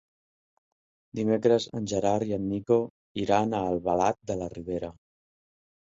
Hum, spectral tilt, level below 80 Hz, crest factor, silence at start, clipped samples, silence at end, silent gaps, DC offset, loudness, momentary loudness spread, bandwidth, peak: none; -6 dB/octave; -56 dBFS; 20 dB; 1.15 s; under 0.1%; 0.9 s; 2.90-3.15 s; under 0.1%; -28 LUFS; 10 LU; 7.8 kHz; -8 dBFS